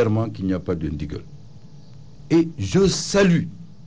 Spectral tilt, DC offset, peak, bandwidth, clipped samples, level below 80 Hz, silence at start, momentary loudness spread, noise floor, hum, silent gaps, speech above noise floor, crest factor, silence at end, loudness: -6 dB/octave; 0.8%; -10 dBFS; 8 kHz; under 0.1%; -42 dBFS; 0 s; 14 LU; -44 dBFS; none; none; 24 dB; 12 dB; 0.2 s; -21 LUFS